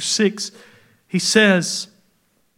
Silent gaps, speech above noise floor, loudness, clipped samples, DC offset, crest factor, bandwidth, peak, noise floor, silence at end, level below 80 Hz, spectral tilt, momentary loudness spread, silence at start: none; 45 dB; -18 LUFS; under 0.1%; under 0.1%; 20 dB; 16 kHz; 0 dBFS; -63 dBFS; 0.75 s; -72 dBFS; -3.5 dB/octave; 16 LU; 0 s